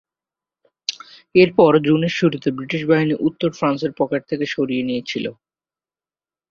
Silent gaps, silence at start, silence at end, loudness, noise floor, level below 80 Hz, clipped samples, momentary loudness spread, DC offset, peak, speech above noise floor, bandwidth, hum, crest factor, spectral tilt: none; 0.9 s; 1.2 s; -19 LUFS; under -90 dBFS; -60 dBFS; under 0.1%; 14 LU; under 0.1%; -2 dBFS; over 72 dB; 7.2 kHz; none; 18 dB; -6.5 dB/octave